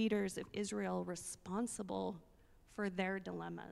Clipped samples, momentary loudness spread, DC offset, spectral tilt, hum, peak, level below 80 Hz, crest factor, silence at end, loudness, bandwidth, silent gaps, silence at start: under 0.1%; 7 LU; under 0.1%; -5 dB/octave; none; -22 dBFS; -68 dBFS; 18 dB; 0 s; -42 LUFS; 14 kHz; none; 0 s